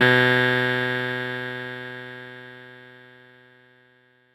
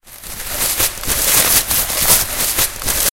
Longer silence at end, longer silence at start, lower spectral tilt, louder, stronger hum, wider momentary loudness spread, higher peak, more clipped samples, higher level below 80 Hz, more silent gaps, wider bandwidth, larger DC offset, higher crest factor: first, 1.45 s vs 0 s; about the same, 0 s vs 0.05 s; first, -6 dB/octave vs -0.5 dB/octave; second, -22 LUFS vs -13 LUFS; neither; first, 24 LU vs 9 LU; second, -4 dBFS vs 0 dBFS; neither; second, -66 dBFS vs -32 dBFS; neither; second, 16 kHz vs 18 kHz; neither; about the same, 20 dB vs 16 dB